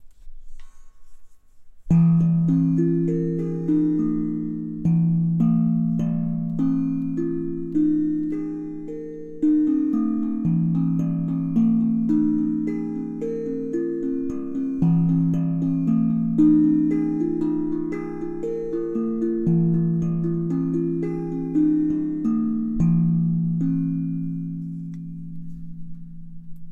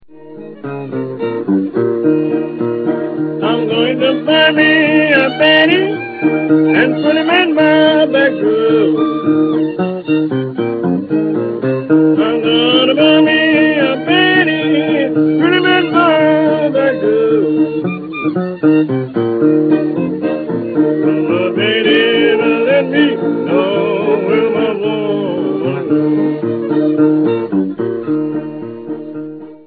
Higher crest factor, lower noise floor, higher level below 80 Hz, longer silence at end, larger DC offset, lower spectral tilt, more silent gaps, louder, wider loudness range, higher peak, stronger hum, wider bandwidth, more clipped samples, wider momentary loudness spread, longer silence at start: about the same, 16 dB vs 12 dB; first, -43 dBFS vs -33 dBFS; first, -46 dBFS vs -58 dBFS; about the same, 0 s vs 0.1 s; neither; first, -11.5 dB/octave vs -9 dB/octave; neither; second, -22 LUFS vs -13 LUFS; about the same, 3 LU vs 4 LU; second, -6 dBFS vs 0 dBFS; neither; second, 2.8 kHz vs 4.7 kHz; neither; about the same, 11 LU vs 9 LU; about the same, 0 s vs 0.1 s